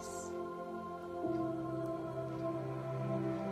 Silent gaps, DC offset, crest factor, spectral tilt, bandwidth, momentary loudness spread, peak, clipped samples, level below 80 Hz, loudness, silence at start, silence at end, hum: none; under 0.1%; 14 dB; -7 dB/octave; 14 kHz; 6 LU; -26 dBFS; under 0.1%; -68 dBFS; -40 LUFS; 0 s; 0 s; none